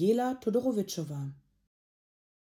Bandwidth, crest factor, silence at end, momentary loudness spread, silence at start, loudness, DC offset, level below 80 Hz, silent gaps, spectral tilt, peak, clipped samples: 17.5 kHz; 16 dB; 1.15 s; 11 LU; 0 s; -31 LUFS; under 0.1%; -72 dBFS; none; -6.5 dB/octave; -16 dBFS; under 0.1%